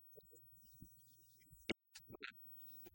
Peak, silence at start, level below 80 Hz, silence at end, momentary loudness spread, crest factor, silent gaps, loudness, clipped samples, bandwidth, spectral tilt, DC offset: -26 dBFS; 0 s; -76 dBFS; 0 s; 16 LU; 30 dB; none; -54 LUFS; under 0.1%; 16.5 kHz; -3.5 dB/octave; under 0.1%